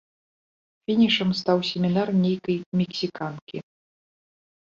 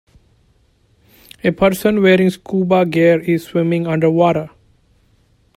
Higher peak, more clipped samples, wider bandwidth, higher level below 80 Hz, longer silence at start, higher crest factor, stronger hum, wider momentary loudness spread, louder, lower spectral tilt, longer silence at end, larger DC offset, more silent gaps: second, -8 dBFS vs 0 dBFS; neither; second, 7.2 kHz vs 16 kHz; second, -64 dBFS vs -48 dBFS; second, 0.9 s vs 1.45 s; about the same, 18 dB vs 16 dB; neither; first, 17 LU vs 8 LU; second, -24 LUFS vs -15 LUFS; about the same, -6.5 dB/octave vs -7 dB/octave; about the same, 1.1 s vs 1.1 s; neither; first, 2.66-2.72 s, 3.42-3.47 s vs none